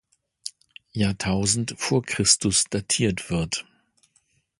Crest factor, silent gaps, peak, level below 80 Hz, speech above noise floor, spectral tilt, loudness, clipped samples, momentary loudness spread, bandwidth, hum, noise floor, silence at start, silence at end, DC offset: 22 dB; none; -4 dBFS; -48 dBFS; 43 dB; -3 dB/octave; -23 LUFS; under 0.1%; 18 LU; 11.5 kHz; none; -67 dBFS; 0.45 s; 0.95 s; under 0.1%